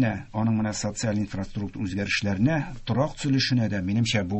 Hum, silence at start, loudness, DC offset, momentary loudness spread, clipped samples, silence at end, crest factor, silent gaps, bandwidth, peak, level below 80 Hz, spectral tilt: none; 0 s; -26 LUFS; under 0.1%; 7 LU; under 0.1%; 0 s; 14 dB; none; 8.6 kHz; -10 dBFS; -46 dBFS; -5.5 dB/octave